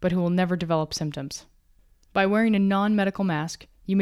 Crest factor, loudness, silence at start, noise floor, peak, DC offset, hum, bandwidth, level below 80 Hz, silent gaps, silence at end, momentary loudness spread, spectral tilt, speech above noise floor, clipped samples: 16 dB; -24 LUFS; 0 s; -59 dBFS; -8 dBFS; under 0.1%; none; 13 kHz; -54 dBFS; none; 0 s; 13 LU; -6 dB/octave; 35 dB; under 0.1%